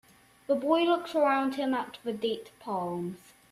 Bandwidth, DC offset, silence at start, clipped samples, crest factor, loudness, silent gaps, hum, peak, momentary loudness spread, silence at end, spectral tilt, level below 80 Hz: 13.5 kHz; under 0.1%; 0.5 s; under 0.1%; 18 dB; -30 LUFS; none; none; -12 dBFS; 12 LU; 0.35 s; -5.5 dB/octave; -72 dBFS